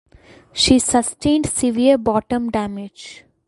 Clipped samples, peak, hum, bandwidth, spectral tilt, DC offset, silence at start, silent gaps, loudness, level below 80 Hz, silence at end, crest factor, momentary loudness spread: under 0.1%; 0 dBFS; none; 11.5 kHz; -3.5 dB/octave; under 0.1%; 0.55 s; none; -17 LUFS; -42 dBFS; 0.3 s; 18 dB; 18 LU